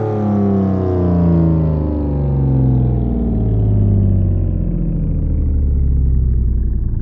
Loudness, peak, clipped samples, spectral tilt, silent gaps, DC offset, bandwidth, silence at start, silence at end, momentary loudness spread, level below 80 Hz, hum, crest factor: -16 LUFS; -2 dBFS; under 0.1%; -13 dB/octave; none; under 0.1%; 3 kHz; 0 s; 0 s; 5 LU; -18 dBFS; none; 12 dB